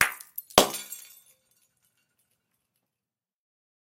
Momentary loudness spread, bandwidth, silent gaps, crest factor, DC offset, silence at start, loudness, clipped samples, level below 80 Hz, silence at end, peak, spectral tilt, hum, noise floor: 19 LU; 16.5 kHz; none; 30 dB; under 0.1%; 0 s; -24 LUFS; under 0.1%; -60 dBFS; 2.85 s; -2 dBFS; -1.5 dB/octave; none; under -90 dBFS